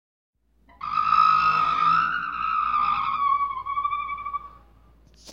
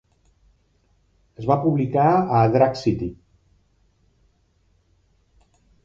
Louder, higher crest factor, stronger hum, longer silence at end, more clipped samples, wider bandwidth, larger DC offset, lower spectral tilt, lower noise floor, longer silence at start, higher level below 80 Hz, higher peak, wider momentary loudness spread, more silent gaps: about the same, -22 LUFS vs -20 LUFS; about the same, 18 dB vs 20 dB; neither; second, 0 s vs 2.7 s; neither; about the same, 7 kHz vs 7.6 kHz; neither; second, -3.5 dB/octave vs -8.5 dB/octave; second, -54 dBFS vs -63 dBFS; second, 0.8 s vs 1.4 s; about the same, -54 dBFS vs -50 dBFS; second, -8 dBFS vs -4 dBFS; about the same, 12 LU vs 11 LU; neither